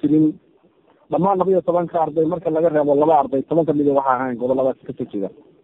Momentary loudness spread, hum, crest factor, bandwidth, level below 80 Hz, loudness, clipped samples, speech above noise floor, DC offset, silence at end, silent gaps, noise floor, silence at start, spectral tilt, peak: 11 LU; none; 16 dB; 3.9 kHz; -60 dBFS; -19 LUFS; under 0.1%; 37 dB; under 0.1%; 0.35 s; none; -56 dBFS; 0.05 s; -10.5 dB/octave; -2 dBFS